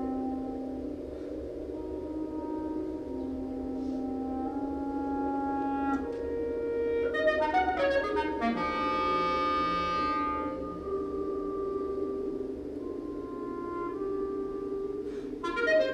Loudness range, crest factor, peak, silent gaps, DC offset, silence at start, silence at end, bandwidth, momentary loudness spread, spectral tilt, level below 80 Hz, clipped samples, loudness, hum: 7 LU; 18 dB; -14 dBFS; none; under 0.1%; 0 s; 0 s; 10 kHz; 10 LU; -6.5 dB/octave; -52 dBFS; under 0.1%; -32 LUFS; none